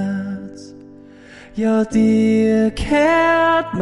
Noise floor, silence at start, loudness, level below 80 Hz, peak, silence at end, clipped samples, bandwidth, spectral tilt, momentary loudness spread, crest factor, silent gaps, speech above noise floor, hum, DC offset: -41 dBFS; 0 s; -16 LUFS; -40 dBFS; -4 dBFS; 0 s; under 0.1%; 11.5 kHz; -6.5 dB/octave; 15 LU; 12 dB; none; 26 dB; none; under 0.1%